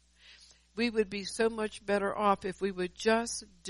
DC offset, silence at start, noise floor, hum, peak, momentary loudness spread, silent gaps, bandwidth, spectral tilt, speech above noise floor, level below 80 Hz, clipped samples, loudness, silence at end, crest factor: under 0.1%; 0.3 s; -58 dBFS; none; -14 dBFS; 7 LU; none; 11.5 kHz; -4 dB/octave; 27 dB; -60 dBFS; under 0.1%; -32 LUFS; 0 s; 18 dB